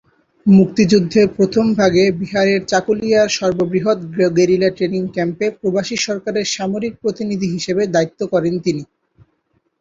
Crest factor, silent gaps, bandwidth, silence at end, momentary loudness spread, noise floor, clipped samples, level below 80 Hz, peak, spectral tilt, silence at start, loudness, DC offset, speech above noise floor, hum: 14 dB; none; 7.8 kHz; 0.95 s; 8 LU; -65 dBFS; under 0.1%; -52 dBFS; -2 dBFS; -5.5 dB/octave; 0.45 s; -16 LUFS; under 0.1%; 49 dB; none